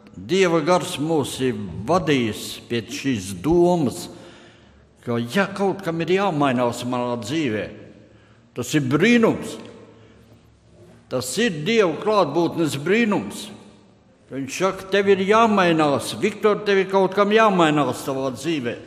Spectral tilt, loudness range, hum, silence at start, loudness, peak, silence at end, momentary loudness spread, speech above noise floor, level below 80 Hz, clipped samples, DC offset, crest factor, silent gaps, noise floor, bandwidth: -5 dB/octave; 5 LU; none; 0.15 s; -20 LUFS; -2 dBFS; 0 s; 13 LU; 33 dB; -52 dBFS; under 0.1%; under 0.1%; 20 dB; none; -53 dBFS; 15.5 kHz